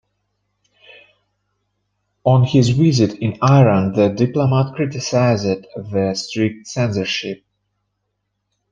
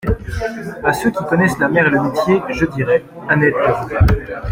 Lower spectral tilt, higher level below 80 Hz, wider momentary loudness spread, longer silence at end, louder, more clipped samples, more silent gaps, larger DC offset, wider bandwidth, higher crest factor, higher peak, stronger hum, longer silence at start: about the same, -6.5 dB/octave vs -7 dB/octave; second, -54 dBFS vs -28 dBFS; about the same, 9 LU vs 8 LU; first, 1.35 s vs 0 s; about the same, -17 LUFS vs -16 LUFS; neither; neither; neither; second, 7.6 kHz vs 16.5 kHz; about the same, 16 dB vs 14 dB; about the same, -2 dBFS vs -2 dBFS; first, 50 Hz at -40 dBFS vs none; first, 2.25 s vs 0.05 s